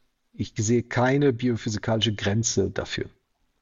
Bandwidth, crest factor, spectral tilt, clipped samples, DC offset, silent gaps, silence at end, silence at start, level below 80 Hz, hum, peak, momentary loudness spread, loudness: 7.8 kHz; 16 dB; -4.5 dB/octave; under 0.1%; under 0.1%; none; 0.55 s; 0.4 s; -52 dBFS; none; -8 dBFS; 11 LU; -25 LUFS